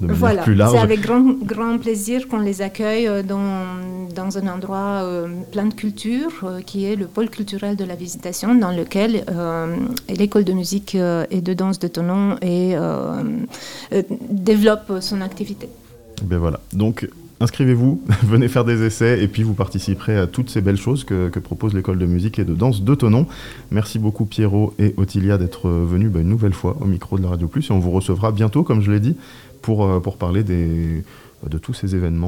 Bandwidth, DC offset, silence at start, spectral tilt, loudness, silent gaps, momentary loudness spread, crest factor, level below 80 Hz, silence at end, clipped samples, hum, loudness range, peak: 16.5 kHz; 0.3%; 0 s; -7 dB/octave; -19 LUFS; none; 11 LU; 18 dB; -42 dBFS; 0 s; under 0.1%; none; 5 LU; 0 dBFS